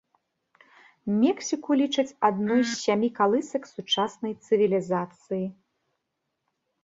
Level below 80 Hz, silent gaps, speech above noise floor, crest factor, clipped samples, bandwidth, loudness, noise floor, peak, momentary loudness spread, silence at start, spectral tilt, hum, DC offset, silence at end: -72 dBFS; none; 55 dB; 18 dB; under 0.1%; 8 kHz; -26 LUFS; -81 dBFS; -8 dBFS; 10 LU; 1.05 s; -4.5 dB/octave; none; under 0.1%; 1.3 s